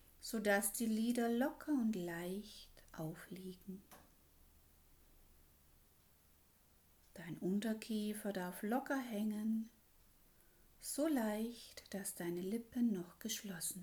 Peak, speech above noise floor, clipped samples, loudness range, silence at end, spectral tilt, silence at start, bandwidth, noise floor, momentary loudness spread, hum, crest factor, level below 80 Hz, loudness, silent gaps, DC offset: -24 dBFS; 30 dB; under 0.1%; 15 LU; 0 s; -4.5 dB/octave; 0.2 s; over 20 kHz; -70 dBFS; 17 LU; none; 20 dB; -70 dBFS; -41 LUFS; none; under 0.1%